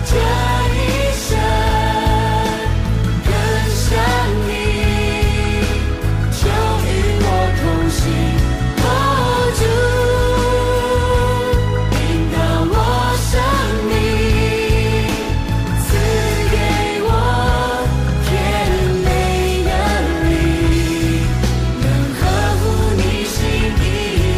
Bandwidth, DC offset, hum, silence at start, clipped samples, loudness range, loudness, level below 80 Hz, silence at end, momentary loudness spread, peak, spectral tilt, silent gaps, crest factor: 15.5 kHz; 0.2%; none; 0 s; under 0.1%; 1 LU; -16 LUFS; -20 dBFS; 0 s; 3 LU; -4 dBFS; -5.5 dB/octave; none; 10 dB